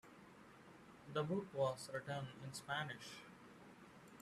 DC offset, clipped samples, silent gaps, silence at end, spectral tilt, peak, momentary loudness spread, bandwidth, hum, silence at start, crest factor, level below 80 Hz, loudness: under 0.1%; under 0.1%; none; 0 s; -5 dB/octave; -28 dBFS; 20 LU; 14 kHz; none; 0.05 s; 20 dB; -80 dBFS; -45 LUFS